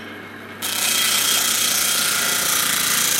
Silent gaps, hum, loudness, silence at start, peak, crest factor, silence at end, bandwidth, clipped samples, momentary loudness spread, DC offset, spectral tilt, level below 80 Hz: none; none; -17 LUFS; 0 s; -4 dBFS; 16 dB; 0 s; 17 kHz; under 0.1%; 14 LU; under 0.1%; 1 dB/octave; -60 dBFS